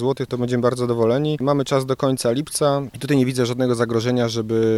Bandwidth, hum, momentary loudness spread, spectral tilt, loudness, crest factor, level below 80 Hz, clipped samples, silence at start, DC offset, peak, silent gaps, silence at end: 15.5 kHz; none; 2 LU; -6 dB/octave; -20 LUFS; 14 dB; -54 dBFS; under 0.1%; 0 s; under 0.1%; -4 dBFS; none; 0 s